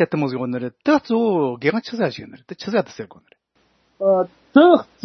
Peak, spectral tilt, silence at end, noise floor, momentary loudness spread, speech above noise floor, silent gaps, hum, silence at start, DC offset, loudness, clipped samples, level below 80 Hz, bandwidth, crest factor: 0 dBFS; -7 dB/octave; 0.2 s; -63 dBFS; 19 LU; 44 dB; none; none; 0 s; under 0.1%; -19 LUFS; under 0.1%; -66 dBFS; 6.4 kHz; 20 dB